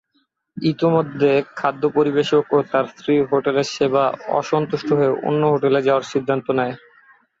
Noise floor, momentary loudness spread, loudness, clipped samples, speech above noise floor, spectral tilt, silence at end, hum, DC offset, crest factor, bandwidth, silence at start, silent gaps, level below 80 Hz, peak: -67 dBFS; 5 LU; -19 LUFS; under 0.1%; 49 dB; -6.5 dB/octave; 0.65 s; none; under 0.1%; 14 dB; 7.8 kHz; 0.55 s; none; -62 dBFS; -4 dBFS